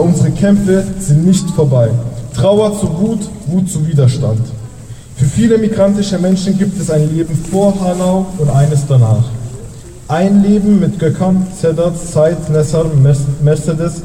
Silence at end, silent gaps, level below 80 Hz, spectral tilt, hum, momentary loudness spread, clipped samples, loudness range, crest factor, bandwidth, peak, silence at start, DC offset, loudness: 0 s; none; -34 dBFS; -7.5 dB/octave; none; 8 LU; under 0.1%; 2 LU; 10 dB; 15 kHz; -2 dBFS; 0 s; under 0.1%; -12 LUFS